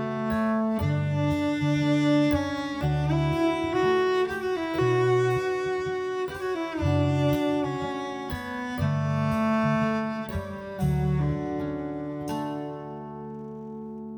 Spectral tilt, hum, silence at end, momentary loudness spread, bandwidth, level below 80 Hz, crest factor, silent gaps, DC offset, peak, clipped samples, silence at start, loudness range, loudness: -7.5 dB/octave; none; 0 s; 11 LU; over 20 kHz; -46 dBFS; 14 dB; none; under 0.1%; -12 dBFS; under 0.1%; 0 s; 5 LU; -26 LUFS